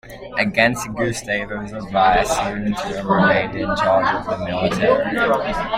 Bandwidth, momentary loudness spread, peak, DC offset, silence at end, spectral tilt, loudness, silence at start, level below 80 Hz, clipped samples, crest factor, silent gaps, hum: 16 kHz; 8 LU; -2 dBFS; under 0.1%; 0 s; -5 dB/octave; -19 LUFS; 0.05 s; -40 dBFS; under 0.1%; 18 dB; none; none